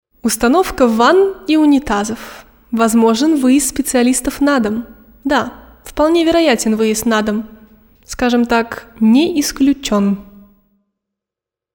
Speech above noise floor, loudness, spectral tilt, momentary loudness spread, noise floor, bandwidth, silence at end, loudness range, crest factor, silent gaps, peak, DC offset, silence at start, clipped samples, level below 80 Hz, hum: 72 dB; -14 LUFS; -4 dB/octave; 12 LU; -86 dBFS; 20 kHz; 1.5 s; 3 LU; 14 dB; none; 0 dBFS; under 0.1%; 0.25 s; under 0.1%; -40 dBFS; none